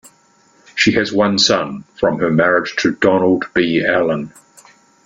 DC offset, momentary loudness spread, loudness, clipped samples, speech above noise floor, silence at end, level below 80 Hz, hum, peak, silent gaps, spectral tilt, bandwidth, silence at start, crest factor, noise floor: under 0.1%; 7 LU; -15 LUFS; under 0.1%; 38 dB; 0.75 s; -52 dBFS; none; 0 dBFS; none; -4.5 dB/octave; 11.5 kHz; 0.75 s; 16 dB; -53 dBFS